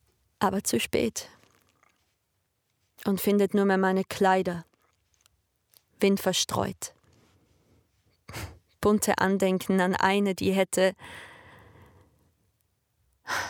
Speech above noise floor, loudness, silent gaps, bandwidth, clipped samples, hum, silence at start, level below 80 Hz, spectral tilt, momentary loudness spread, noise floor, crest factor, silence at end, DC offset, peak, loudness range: 51 dB; -26 LUFS; none; over 20 kHz; under 0.1%; none; 0.4 s; -62 dBFS; -4.5 dB/octave; 18 LU; -76 dBFS; 20 dB; 0 s; under 0.1%; -8 dBFS; 5 LU